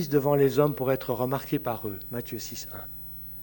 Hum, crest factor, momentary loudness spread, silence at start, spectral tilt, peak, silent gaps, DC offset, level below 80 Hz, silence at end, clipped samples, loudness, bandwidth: 60 Hz at -55 dBFS; 20 dB; 14 LU; 0 s; -6.5 dB/octave; -8 dBFS; none; under 0.1%; -54 dBFS; 0 s; under 0.1%; -28 LUFS; 17 kHz